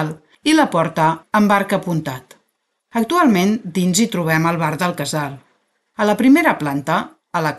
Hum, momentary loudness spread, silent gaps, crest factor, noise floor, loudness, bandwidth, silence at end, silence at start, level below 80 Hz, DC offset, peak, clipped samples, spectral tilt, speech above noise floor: none; 11 LU; none; 16 dB; -70 dBFS; -17 LUFS; 12.5 kHz; 0 s; 0 s; -58 dBFS; under 0.1%; -2 dBFS; under 0.1%; -5 dB/octave; 54 dB